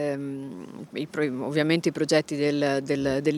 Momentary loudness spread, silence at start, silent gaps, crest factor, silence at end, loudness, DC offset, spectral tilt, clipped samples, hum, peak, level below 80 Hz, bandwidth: 13 LU; 0 s; none; 18 dB; 0 s; -26 LUFS; under 0.1%; -5.5 dB/octave; under 0.1%; none; -6 dBFS; -62 dBFS; 13.5 kHz